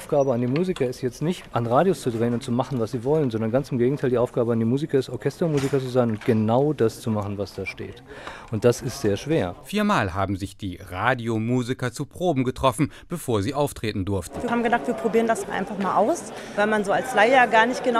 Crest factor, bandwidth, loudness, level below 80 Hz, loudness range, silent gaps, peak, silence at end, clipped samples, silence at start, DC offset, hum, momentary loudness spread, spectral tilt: 20 dB; 15.5 kHz; -23 LUFS; -50 dBFS; 3 LU; none; -4 dBFS; 0 s; under 0.1%; 0 s; under 0.1%; none; 9 LU; -6 dB/octave